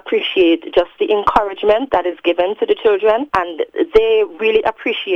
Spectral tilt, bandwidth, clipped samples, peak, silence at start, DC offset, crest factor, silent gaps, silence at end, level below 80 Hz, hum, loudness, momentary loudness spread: -5.5 dB/octave; 6.2 kHz; under 0.1%; 0 dBFS; 0.05 s; under 0.1%; 16 dB; none; 0 s; -44 dBFS; none; -16 LUFS; 5 LU